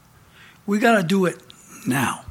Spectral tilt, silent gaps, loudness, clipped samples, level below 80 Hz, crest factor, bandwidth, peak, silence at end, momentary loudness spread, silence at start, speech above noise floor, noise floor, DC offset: -5 dB/octave; none; -21 LUFS; under 0.1%; -62 dBFS; 18 dB; 16.5 kHz; -4 dBFS; 0.1 s; 17 LU; 0.65 s; 30 dB; -50 dBFS; under 0.1%